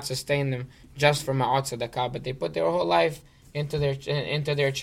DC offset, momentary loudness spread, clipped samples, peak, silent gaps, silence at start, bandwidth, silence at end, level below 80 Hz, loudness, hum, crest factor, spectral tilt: under 0.1%; 10 LU; under 0.1%; -6 dBFS; none; 0 s; 16 kHz; 0 s; -52 dBFS; -26 LUFS; none; 20 dB; -5 dB/octave